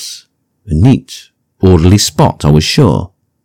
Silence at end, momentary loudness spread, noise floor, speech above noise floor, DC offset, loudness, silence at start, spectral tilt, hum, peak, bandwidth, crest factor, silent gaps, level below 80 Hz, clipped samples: 0.4 s; 22 LU; -45 dBFS; 37 dB; under 0.1%; -10 LUFS; 0 s; -6 dB/octave; none; 0 dBFS; 16.5 kHz; 10 dB; none; -28 dBFS; 3%